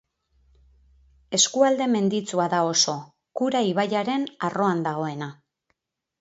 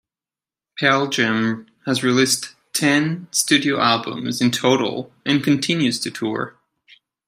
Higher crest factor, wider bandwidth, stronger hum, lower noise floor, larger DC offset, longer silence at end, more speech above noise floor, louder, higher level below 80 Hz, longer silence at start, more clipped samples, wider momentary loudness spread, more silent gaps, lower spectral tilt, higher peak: about the same, 20 dB vs 18 dB; second, 8.2 kHz vs 16 kHz; neither; second, -75 dBFS vs under -90 dBFS; neither; about the same, 0.85 s vs 0.75 s; second, 52 dB vs over 71 dB; second, -23 LUFS vs -19 LUFS; about the same, -66 dBFS vs -66 dBFS; first, 1.3 s vs 0.75 s; neither; about the same, 11 LU vs 9 LU; neither; about the same, -3.5 dB/octave vs -3.5 dB/octave; second, -6 dBFS vs -2 dBFS